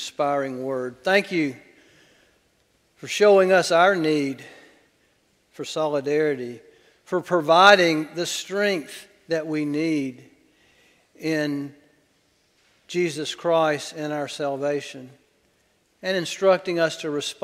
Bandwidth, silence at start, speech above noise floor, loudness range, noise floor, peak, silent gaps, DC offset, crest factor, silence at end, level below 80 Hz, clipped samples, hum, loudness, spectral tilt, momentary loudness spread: 15.5 kHz; 0 s; 43 dB; 8 LU; -65 dBFS; 0 dBFS; none; under 0.1%; 24 dB; 0.1 s; -72 dBFS; under 0.1%; none; -22 LUFS; -4 dB/octave; 16 LU